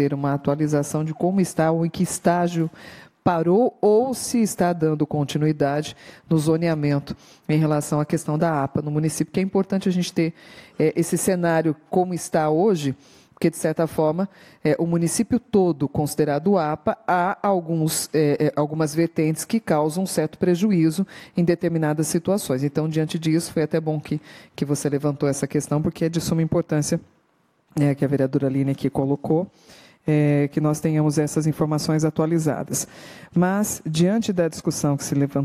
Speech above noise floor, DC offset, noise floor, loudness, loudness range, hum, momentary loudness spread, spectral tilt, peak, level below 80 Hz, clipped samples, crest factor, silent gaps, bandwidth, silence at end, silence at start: 43 dB; under 0.1%; -64 dBFS; -22 LUFS; 2 LU; none; 6 LU; -6 dB/octave; -4 dBFS; -56 dBFS; under 0.1%; 16 dB; none; 16 kHz; 0 s; 0 s